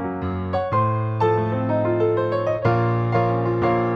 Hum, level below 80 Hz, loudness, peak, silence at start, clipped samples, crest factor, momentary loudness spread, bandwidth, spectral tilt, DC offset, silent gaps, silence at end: none; -50 dBFS; -21 LUFS; -6 dBFS; 0 s; under 0.1%; 14 dB; 3 LU; 6.2 kHz; -9.5 dB/octave; under 0.1%; none; 0 s